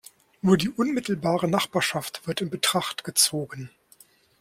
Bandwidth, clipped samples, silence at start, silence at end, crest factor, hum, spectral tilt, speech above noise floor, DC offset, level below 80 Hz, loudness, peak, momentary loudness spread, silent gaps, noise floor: 16.5 kHz; under 0.1%; 0.45 s; 0.75 s; 20 dB; none; -3.5 dB/octave; 32 dB; under 0.1%; -62 dBFS; -24 LUFS; -6 dBFS; 11 LU; none; -57 dBFS